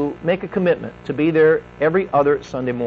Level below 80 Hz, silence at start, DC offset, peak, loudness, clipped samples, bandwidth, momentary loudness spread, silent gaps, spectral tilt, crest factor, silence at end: -50 dBFS; 0 s; under 0.1%; -6 dBFS; -19 LUFS; under 0.1%; 6.8 kHz; 8 LU; none; -8 dB/octave; 14 dB; 0 s